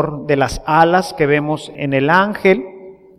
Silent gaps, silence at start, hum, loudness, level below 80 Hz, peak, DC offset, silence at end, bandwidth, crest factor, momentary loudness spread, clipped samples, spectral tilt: none; 0 s; none; -15 LUFS; -40 dBFS; 0 dBFS; under 0.1%; 0.25 s; 14.5 kHz; 16 dB; 8 LU; under 0.1%; -6 dB/octave